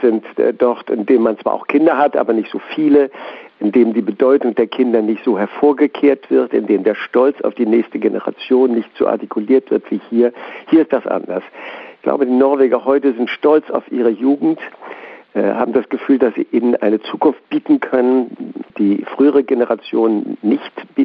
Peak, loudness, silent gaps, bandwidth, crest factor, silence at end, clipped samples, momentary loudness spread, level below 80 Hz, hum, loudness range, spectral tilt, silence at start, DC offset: -2 dBFS; -15 LUFS; none; 5.2 kHz; 14 dB; 0 s; under 0.1%; 9 LU; -66 dBFS; none; 2 LU; -9 dB/octave; 0 s; under 0.1%